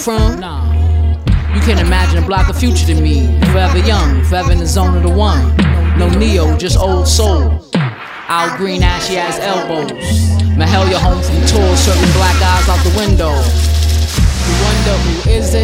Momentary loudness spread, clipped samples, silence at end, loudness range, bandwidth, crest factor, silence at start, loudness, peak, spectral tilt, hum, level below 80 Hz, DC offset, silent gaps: 5 LU; under 0.1%; 0 s; 3 LU; 16 kHz; 10 dB; 0 s; -12 LUFS; 0 dBFS; -5.5 dB/octave; none; -16 dBFS; under 0.1%; none